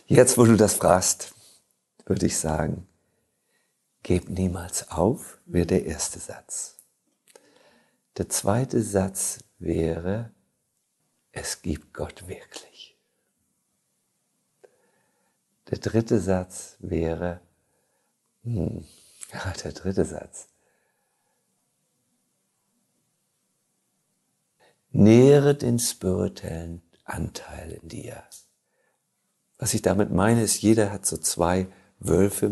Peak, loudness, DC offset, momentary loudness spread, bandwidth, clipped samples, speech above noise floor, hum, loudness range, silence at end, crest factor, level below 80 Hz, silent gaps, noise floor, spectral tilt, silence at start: -2 dBFS; -24 LUFS; under 0.1%; 21 LU; 12.5 kHz; under 0.1%; 51 dB; none; 15 LU; 0 s; 24 dB; -44 dBFS; none; -74 dBFS; -5.5 dB/octave; 0.1 s